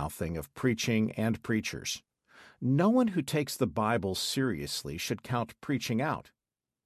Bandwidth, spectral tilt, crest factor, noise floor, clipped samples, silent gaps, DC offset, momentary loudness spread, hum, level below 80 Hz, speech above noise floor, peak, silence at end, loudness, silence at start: 14 kHz; -5 dB/octave; 16 dB; under -90 dBFS; under 0.1%; none; under 0.1%; 9 LU; none; -54 dBFS; over 60 dB; -14 dBFS; 0.65 s; -31 LUFS; 0 s